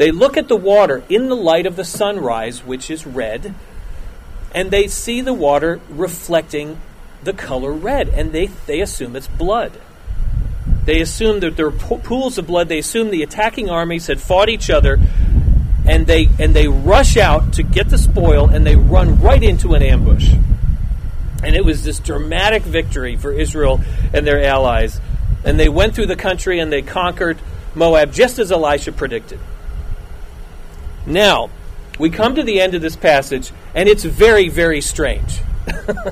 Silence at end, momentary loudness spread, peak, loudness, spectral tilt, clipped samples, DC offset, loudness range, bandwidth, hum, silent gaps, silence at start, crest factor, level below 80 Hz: 0 s; 14 LU; 0 dBFS; -15 LUFS; -5.5 dB/octave; under 0.1%; under 0.1%; 8 LU; 15 kHz; none; none; 0 s; 14 dB; -18 dBFS